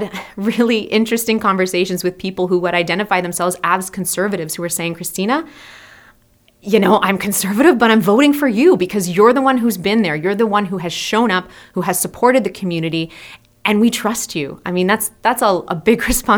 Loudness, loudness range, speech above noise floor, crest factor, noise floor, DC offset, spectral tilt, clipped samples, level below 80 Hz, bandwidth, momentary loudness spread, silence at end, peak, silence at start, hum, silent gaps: -16 LUFS; 6 LU; 38 dB; 16 dB; -54 dBFS; under 0.1%; -4.5 dB/octave; under 0.1%; -42 dBFS; over 20 kHz; 9 LU; 0 s; 0 dBFS; 0 s; none; none